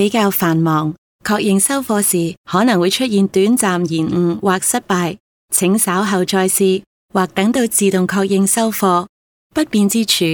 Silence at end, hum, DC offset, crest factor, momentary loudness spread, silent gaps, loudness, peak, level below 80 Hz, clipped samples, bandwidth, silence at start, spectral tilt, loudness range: 0 s; none; under 0.1%; 14 dB; 6 LU; 0.98-1.19 s, 2.37-2.44 s, 5.20-5.48 s, 6.87-7.09 s, 9.09-9.50 s; -15 LUFS; -2 dBFS; -54 dBFS; under 0.1%; 19 kHz; 0 s; -4 dB/octave; 1 LU